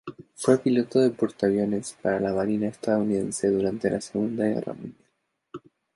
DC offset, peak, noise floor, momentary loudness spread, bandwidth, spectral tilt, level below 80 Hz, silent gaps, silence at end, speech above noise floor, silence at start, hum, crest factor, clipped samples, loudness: under 0.1%; -6 dBFS; -74 dBFS; 20 LU; 11.5 kHz; -6 dB/octave; -60 dBFS; none; 0.35 s; 49 dB; 0.05 s; none; 20 dB; under 0.1%; -25 LUFS